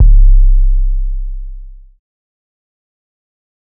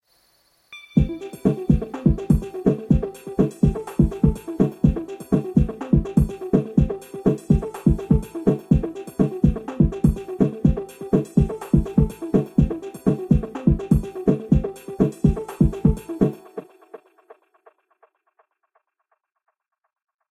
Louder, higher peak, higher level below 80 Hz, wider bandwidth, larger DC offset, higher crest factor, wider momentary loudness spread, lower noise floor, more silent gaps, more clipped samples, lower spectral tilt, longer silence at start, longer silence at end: first, -15 LUFS vs -22 LUFS; first, 0 dBFS vs -4 dBFS; first, -10 dBFS vs -30 dBFS; second, 0.2 kHz vs 13 kHz; neither; second, 10 dB vs 18 dB; first, 21 LU vs 5 LU; second, -29 dBFS vs -72 dBFS; neither; neither; first, -19 dB/octave vs -9.5 dB/octave; second, 0 s vs 0.7 s; second, 2 s vs 3.35 s